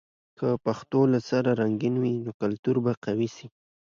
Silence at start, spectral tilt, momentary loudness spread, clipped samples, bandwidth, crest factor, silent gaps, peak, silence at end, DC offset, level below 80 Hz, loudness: 0.4 s; -8 dB/octave; 7 LU; under 0.1%; 7.4 kHz; 16 dB; 2.34-2.40 s, 2.59-2.63 s, 2.97-3.02 s; -10 dBFS; 0.4 s; under 0.1%; -66 dBFS; -26 LUFS